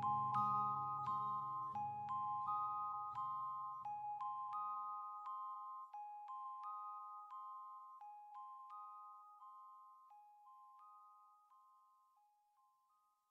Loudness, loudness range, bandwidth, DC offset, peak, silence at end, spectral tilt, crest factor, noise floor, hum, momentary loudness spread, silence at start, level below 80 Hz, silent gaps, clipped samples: -45 LUFS; 20 LU; 7.8 kHz; under 0.1%; -28 dBFS; 1.5 s; -7 dB/octave; 20 dB; -80 dBFS; none; 22 LU; 0 s; under -90 dBFS; none; under 0.1%